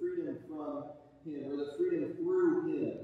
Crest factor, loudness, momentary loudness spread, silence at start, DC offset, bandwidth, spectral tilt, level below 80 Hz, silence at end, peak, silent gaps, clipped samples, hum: 14 dB; -35 LUFS; 14 LU; 0 s; under 0.1%; 7.2 kHz; -8.5 dB/octave; -76 dBFS; 0 s; -20 dBFS; none; under 0.1%; none